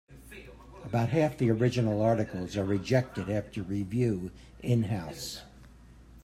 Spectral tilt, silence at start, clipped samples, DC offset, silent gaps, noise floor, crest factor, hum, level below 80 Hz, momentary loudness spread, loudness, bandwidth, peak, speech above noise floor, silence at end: -7 dB/octave; 0.1 s; under 0.1%; under 0.1%; none; -53 dBFS; 18 dB; none; -54 dBFS; 19 LU; -30 LUFS; 14 kHz; -12 dBFS; 24 dB; 0 s